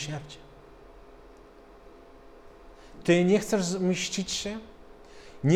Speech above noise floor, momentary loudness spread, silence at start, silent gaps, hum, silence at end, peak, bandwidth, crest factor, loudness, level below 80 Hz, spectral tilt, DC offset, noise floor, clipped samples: 25 dB; 26 LU; 0 s; none; none; 0 s; -10 dBFS; 14.5 kHz; 20 dB; -27 LUFS; -54 dBFS; -5 dB/octave; under 0.1%; -51 dBFS; under 0.1%